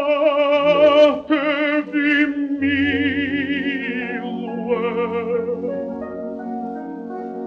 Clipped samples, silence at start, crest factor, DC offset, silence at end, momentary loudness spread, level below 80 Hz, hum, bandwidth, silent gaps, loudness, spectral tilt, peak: under 0.1%; 0 s; 16 dB; under 0.1%; 0 s; 14 LU; -58 dBFS; none; 6.6 kHz; none; -19 LUFS; -6.5 dB/octave; -2 dBFS